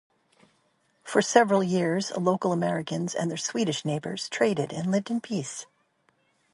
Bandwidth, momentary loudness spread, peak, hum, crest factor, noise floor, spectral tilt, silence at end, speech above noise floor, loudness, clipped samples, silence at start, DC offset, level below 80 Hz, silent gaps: 11.5 kHz; 11 LU; -4 dBFS; none; 24 dB; -69 dBFS; -5 dB/octave; 0.9 s; 43 dB; -26 LUFS; under 0.1%; 1.05 s; under 0.1%; -72 dBFS; none